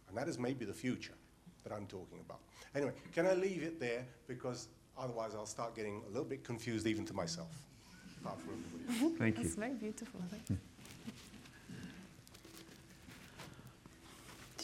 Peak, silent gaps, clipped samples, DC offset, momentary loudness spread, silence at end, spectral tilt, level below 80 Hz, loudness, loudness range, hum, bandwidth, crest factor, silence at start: -20 dBFS; none; under 0.1%; under 0.1%; 20 LU; 0 s; -5.5 dB/octave; -68 dBFS; -42 LUFS; 10 LU; none; 16 kHz; 22 dB; 0.05 s